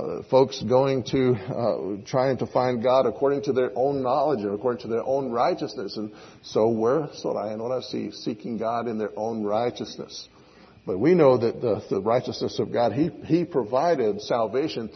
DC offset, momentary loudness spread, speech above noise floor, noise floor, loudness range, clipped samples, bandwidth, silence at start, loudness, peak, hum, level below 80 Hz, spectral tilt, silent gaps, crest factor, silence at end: under 0.1%; 10 LU; 28 dB; -52 dBFS; 5 LU; under 0.1%; 6.4 kHz; 0 s; -24 LUFS; -6 dBFS; none; -62 dBFS; -7 dB/octave; none; 18 dB; 0 s